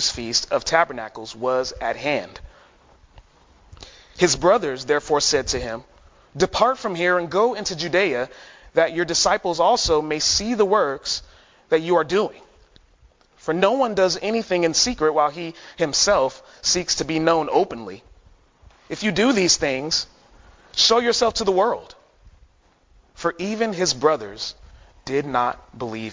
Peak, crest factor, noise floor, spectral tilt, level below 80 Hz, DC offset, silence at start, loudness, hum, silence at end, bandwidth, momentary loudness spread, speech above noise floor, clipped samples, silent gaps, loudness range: -2 dBFS; 20 dB; -58 dBFS; -2.5 dB/octave; -48 dBFS; under 0.1%; 0 s; -21 LUFS; none; 0 s; 7.6 kHz; 13 LU; 37 dB; under 0.1%; none; 4 LU